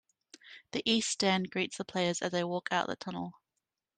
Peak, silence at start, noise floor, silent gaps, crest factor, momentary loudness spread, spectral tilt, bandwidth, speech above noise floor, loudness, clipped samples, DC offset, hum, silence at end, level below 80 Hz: -14 dBFS; 0.45 s; -87 dBFS; none; 20 dB; 12 LU; -3.5 dB/octave; 9.8 kHz; 54 dB; -32 LUFS; under 0.1%; under 0.1%; none; 0.65 s; -74 dBFS